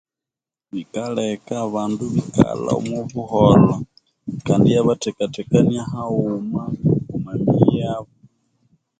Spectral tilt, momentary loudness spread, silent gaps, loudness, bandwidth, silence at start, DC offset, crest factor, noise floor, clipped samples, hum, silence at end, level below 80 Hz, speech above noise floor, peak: -7.5 dB/octave; 14 LU; none; -19 LUFS; 9.2 kHz; 0.75 s; under 0.1%; 20 dB; -89 dBFS; under 0.1%; none; 0.95 s; -46 dBFS; 70 dB; 0 dBFS